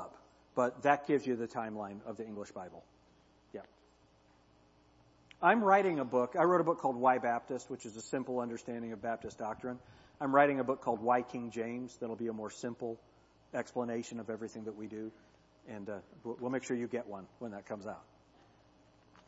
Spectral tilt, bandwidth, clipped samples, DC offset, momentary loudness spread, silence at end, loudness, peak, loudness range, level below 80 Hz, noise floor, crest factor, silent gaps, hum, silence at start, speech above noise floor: -5 dB/octave; 7.6 kHz; under 0.1%; under 0.1%; 18 LU; 1.25 s; -35 LUFS; -12 dBFS; 12 LU; -74 dBFS; -66 dBFS; 24 dB; none; none; 0 s; 32 dB